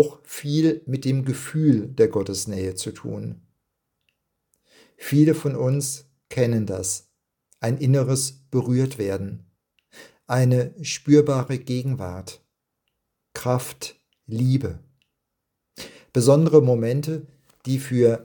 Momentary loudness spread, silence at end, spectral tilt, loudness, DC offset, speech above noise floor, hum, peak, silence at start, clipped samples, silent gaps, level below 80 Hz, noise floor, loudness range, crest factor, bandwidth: 17 LU; 0 s; -6.5 dB/octave; -22 LUFS; under 0.1%; 58 dB; none; -2 dBFS; 0 s; under 0.1%; none; -60 dBFS; -80 dBFS; 7 LU; 22 dB; 18 kHz